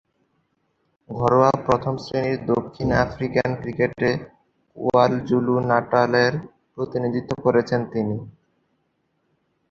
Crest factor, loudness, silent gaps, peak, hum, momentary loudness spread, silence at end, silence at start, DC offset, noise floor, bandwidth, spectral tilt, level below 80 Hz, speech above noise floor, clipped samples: 20 dB; -22 LUFS; none; -2 dBFS; none; 10 LU; 1.4 s; 1.1 s; under 0.1%; -70 dBFS; 7.4 kHz; -7.5 dB/octave; -48 dBFS; 49 dB; under 0.1%